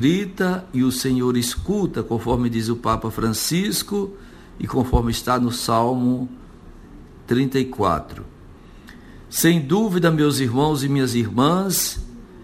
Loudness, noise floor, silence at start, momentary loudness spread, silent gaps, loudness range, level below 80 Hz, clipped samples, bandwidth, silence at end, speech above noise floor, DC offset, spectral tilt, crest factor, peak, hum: -21 LUFS; -43 dBFS; 0 s; 8 LU; none; 4 LU; -36 dBFS; under 0.1%; 15.5 kHz; 0 s; 23 dB; under 0.1%; -5 dB/octave; 18 dB; -2 dBFS; none